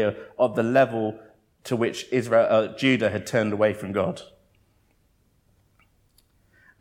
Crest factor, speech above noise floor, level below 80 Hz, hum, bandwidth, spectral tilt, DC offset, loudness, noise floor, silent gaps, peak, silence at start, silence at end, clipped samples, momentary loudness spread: 18 dB; 42 dB; -66 dBFS; none; 15.5 kHz; -6 dB/octave; under 0.1%; -23 LUFS; -65 dBFS; none; -6 dBFS; 0 s; 2.55 s; under 0.1%; 10 LU